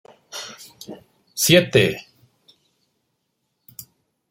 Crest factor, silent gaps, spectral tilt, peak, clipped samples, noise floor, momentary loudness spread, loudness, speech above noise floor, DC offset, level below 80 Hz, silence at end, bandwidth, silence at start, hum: 24 dB; none; -3.5 dB/octave; 0 dBFS; under 0.1%; -74 dBFS; 26 LU; -17 LUFS; 56 dB; under 0.1%; -60 dBFS; 2.3 s; 16.5 kHz; 0.35 s; none